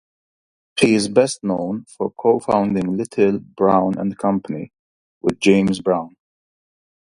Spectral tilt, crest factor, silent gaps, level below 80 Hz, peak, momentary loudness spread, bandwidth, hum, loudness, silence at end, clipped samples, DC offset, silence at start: -5.5 dB/octave; 20 dB; 4.79-5.21 s; -54 dBFS; 0 dBFS; 11 LU; 11.5 kHz; none; -19 LUFS; 1.1 s; under 0.1%; under 0.1%; 0.75 s